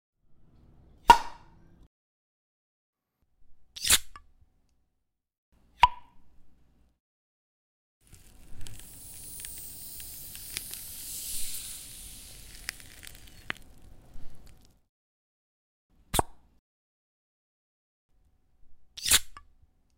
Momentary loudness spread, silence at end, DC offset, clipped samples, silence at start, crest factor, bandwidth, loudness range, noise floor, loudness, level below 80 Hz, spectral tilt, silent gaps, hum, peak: 23 LU; 0.6 s; under 0.1%; under 0.1%; 0.3 s; 28 dB; 16.5 kHz; 15 LU; -79 dBFS; -28 LUFS; -50 dBFS; -0.5 dB/octave; 1.87-2.93 s, 5.38-5.52 s, 7.00-8.01 s, 14.89-15.90 s, 16.59-18.09 s; none; -6 dBFS